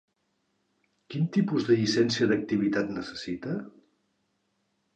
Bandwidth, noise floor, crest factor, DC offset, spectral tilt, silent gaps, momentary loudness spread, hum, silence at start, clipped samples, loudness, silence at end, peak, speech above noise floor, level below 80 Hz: 9.2 kHz; -75 dBFS; 18 dB; under 0.1%; -6 dB/octave; none; 11 LU; none; 1.1 s; under 0.1%; -27 LUFS; 1.25 s; -12 dBFS; 49 dB; -64 dBFS